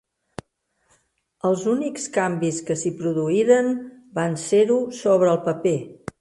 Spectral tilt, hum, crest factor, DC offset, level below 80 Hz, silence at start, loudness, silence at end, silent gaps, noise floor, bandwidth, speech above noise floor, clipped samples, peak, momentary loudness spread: -5.5 dB/octave; none; 18 dB; under 0.1%; -64 dBFS; 1.45 s; -22 LUFS; 0.25 s; none; -69 dBFS; 11.5 kHz; 49 dB; under 0.1%; -6 dBFS; 13 LU